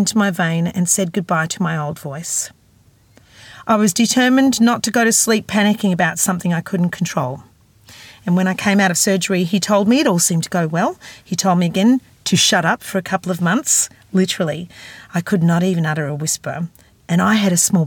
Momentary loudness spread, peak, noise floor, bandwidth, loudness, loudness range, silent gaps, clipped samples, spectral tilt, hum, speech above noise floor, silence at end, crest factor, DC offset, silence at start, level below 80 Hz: 11 LU; -2 dBFS; -52 dBFS; 18 kHz; -17 LUFS; 4 LU; none; under 0.1%; -4 dB/octave; none; 36 dB; 0 s; 16 dB; under 0.1%; 0 s; -58 dBFS